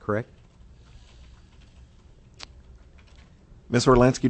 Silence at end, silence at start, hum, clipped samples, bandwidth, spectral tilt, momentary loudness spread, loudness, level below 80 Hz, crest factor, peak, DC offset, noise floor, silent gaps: 0 s; 0.1 s; none; under 0.1%; 8.6 kHz; -6 dB/octave; 27 LU; -22 LUFS; -44 dBFS; 22 dB; -4 dBFS; under 0.1%; -52 dBFS; none